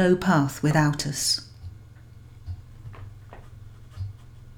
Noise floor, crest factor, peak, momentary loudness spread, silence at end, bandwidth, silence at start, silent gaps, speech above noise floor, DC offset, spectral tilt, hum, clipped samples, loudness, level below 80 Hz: -46 dBFS; 20 dB; -8 dBFS; 25 LU; 0.05 s; 17.5 kHz; 0 s; none; 24 dB; under 0.1%; -4.5 dB/octave; none; under 0.1%; -23 LUFS; -48 dBFS